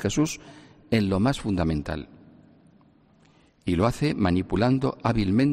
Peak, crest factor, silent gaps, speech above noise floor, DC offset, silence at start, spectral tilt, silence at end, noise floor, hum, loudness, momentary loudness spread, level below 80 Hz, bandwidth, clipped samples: -8 dBFS; 18 dB; none; 35 dB; under 0.1%; 0 s; -6.5 dB/octave; 0 s; -59 dBFS; none; -25 LUFS; 12 LU; -44 dBFS; 14 kHz; under 0.1%